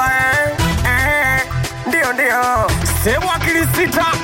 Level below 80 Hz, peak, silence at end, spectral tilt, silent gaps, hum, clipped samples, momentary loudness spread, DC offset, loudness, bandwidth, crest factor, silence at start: -28 dBFS; -6 dBFS; 0 s; -4 dB/octave; none; none; under 0.1%; 3 LU; under 0.1%; -15 LUFS; 17 kHz; 10 dB; 0 s